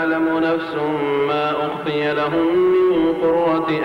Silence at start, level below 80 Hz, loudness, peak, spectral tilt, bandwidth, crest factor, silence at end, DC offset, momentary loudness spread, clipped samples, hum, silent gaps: 0 s; -52 dBFS; -18 LUFS; -10 dBFS; -7.5 dB/octave; 6 kHz; 8 dB; 0 s; under 0.1%; 6 LU; under 0.1%; none; none